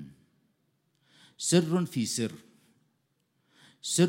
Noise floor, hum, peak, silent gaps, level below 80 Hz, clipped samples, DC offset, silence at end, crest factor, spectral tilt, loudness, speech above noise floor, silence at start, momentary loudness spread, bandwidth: -75 dBFS; none; -10 dBFS; none; -76 dBFS; under 0.1%; under 0.1%; 0 s; 22 dB; -4.5 dB/octave; -29 LUFS; 47 dB; 0 s; 20 LU; 16 kHz